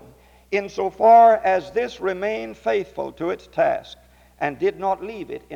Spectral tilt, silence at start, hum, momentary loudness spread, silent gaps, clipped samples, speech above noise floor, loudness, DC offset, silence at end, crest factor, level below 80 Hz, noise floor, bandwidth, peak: -5.5 dB/octave; 0.5 s; none; 15 LU; none; under 0.1%; 29 dB; -21 LUFS; under 0.1%; 0 s; 18 dB; -54 dBFS; -50 dBFS; 7.4 kHz; -4 dBFS